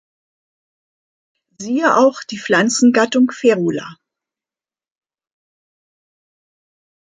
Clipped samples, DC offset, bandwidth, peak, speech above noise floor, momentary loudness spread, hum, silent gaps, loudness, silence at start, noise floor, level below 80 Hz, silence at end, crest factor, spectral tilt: under 0.1%; under 0.1%; 9.4 kHz; -2 dBFS; over 75 dB; 14 LU; none; none; -15 LUFS; 1.6 s; under -90 dBFS; -68 dBFS; 3.1 s; 18 dB; -4 dB/octave